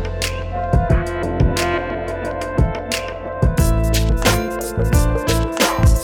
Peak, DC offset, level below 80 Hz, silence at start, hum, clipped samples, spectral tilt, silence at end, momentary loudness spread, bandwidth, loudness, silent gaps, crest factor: -2 dBFS; under 0.1%; -22 dBFS; 0 s; none; under 0.1%; -5 dB/octave; 0 s; 7 LU; 19.5 kHz; -19 LUFS; none; 16 dB